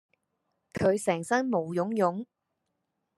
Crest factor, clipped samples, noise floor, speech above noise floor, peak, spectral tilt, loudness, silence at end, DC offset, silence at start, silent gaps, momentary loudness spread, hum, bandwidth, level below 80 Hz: 20 dB; under 0.1%; -81 dBFS; 54 dB; -12 dBFS; -6 dB/octave; -28 LUFS; 0.95 s; under 0.1%; 0.75 s; none; 14 LU; none; 13 kHz; -66 dBFS